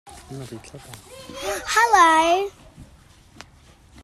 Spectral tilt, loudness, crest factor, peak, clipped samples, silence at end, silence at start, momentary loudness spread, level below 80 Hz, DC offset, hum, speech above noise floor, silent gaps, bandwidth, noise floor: -2.5 dB/octave; -18 LUFS; 20 dB; -4 dBFS; under 0.1%; 1.2 s; 0.05 s; 26 LU; -52 dBFS; under 0.1%; none; 30 dB; none; 15 kHz; -51 dBFS